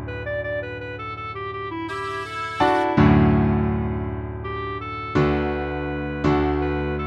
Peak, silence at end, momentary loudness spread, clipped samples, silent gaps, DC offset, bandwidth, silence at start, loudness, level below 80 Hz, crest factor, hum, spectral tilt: -2 dBFS; 0 s; 13 LU; under 0.1%; none; under 0.1%; 10.5 kHz; 0 s; -23 LUFS; -34 dBFS; 20 dB; none; -8 dB/octave